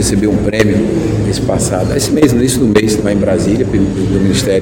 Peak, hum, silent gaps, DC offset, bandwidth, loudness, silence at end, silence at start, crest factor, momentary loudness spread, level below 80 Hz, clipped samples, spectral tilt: 0 dBFS; none; none; under 0.1%; 17 kHz; -12 LUFS; 0 s; 0 s; 12 dB; 4 LU; -28 dBFS; 0.4%; -5.5 dB/octave